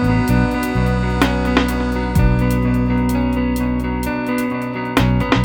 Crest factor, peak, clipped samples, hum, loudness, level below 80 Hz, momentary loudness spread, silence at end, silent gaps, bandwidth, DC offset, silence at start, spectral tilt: 16 dB; -2 dBFS; under 0.1%; none; -18 LUFS; -24 dBFS; 5 LU; 0 s; none; 18 kHz; under 0.1%; 0 s; -7 dB/octave